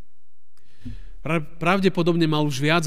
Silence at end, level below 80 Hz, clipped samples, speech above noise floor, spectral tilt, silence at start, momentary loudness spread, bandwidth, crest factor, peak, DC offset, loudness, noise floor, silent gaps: 0 s; -48 dBFS; under 0.1%; 52 dB; -6 dB/octave; 0.85 s; 21 LU; 15.5 kHz; 18 dB; -6 dBFS; 3%; -22 LUFS; -73 dBFS; none